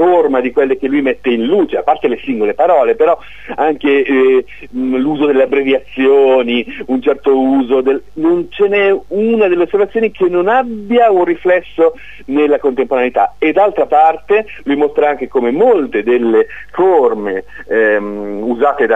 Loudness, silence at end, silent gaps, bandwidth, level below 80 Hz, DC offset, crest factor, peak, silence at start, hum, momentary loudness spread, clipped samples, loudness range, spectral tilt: -13 LUFS; 0 s; none; 3.9 kHz; -48 dBFS; 2%; 12 dB; 0 dBFS; 0 s; none; 6 LU; under 0.1%; 1 LU; -7 dB/octave